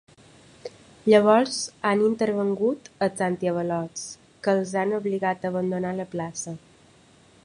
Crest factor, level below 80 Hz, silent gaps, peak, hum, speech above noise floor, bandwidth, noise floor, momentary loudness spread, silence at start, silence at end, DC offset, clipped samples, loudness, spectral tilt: 20 dB; -66 dBFS; none; -6 dBFS; none; 32 dB; 11.5 kHz; -55 dBFS; 17 LU; 0.65 s; 0.9 s; under 0.1%; under 0.1%; -24 LUFS; -5 dB/octave